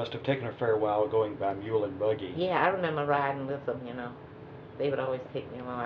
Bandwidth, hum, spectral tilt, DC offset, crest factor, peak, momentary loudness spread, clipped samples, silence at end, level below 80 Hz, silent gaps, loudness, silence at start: 5.6 kHz; none; -4.5 dB/octave; under 0.1%; 20 dB; -10 dBFS; 13 LU; under 0.1%; 0 s; -64 dBFS; none; -30 LUFS; 0 s